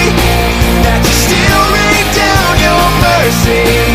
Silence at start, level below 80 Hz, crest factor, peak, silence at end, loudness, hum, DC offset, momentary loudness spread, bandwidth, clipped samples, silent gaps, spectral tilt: 0 s; -16 dBFS; 8 dB; 0 dBFS; 0 s; -8 LUFS; none; under 0.1%; 2 LU; 16 kHz; 0.4%; none; -4 dB/octave